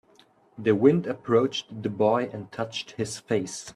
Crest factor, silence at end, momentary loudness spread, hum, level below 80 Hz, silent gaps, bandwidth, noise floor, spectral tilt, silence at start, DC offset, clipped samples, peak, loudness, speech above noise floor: 20 dB; 0.05 s; 12 LU; none; -66 dBFS; none; 12.5 kHz; -59 dBFS; -5.5 dB/octave; 0.6 s; under 0.1%; under 0.1%; -6 dBFS; -26 LUFS; 34 dB